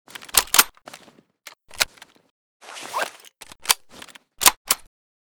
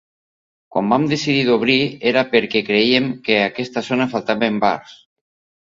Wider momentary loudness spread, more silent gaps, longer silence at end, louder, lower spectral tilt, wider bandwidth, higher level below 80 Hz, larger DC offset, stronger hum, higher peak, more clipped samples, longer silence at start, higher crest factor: first, 23 LU vs 6 LU; first, 2.30-2.60 s, 4.57-4.65 s vs none; about the same, 0.6 s vs 0.7 s; second, -20 LUFS vs -17 LUFS; second, 1.5 dB/octave vs -5.5 dB/octave; first, over 20 kHz vs 7.8 kHz; about the same, -54 dBFS vs -58 dBFS; neither; neither; about the same, 0 dBFS vs 0 dBFS; neither; second, 0.35 s vs 0.75 s; first, 26 dB vs 18 dB